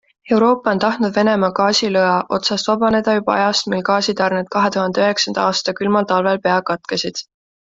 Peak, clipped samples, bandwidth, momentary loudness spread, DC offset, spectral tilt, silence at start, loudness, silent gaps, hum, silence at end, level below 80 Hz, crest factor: -2 dBFS; under 0.1%; 7.8 kHz; 4 LU; under 0.1%; -4 dB/octave; 0.25 s; -17 LUFS; none; none; 0.45 s; -56 dBFS; 16 dB